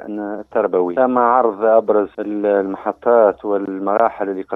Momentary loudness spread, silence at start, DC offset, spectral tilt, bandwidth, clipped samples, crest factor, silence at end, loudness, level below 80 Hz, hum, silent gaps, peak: 9 LU; 0 s; under 0.1%; -9.5 dB/octave; 3.9 kHz; under 0.1%; 16 dB; 0 s; -17 LUFS; -60 dBFS; none; none; 0 dBFS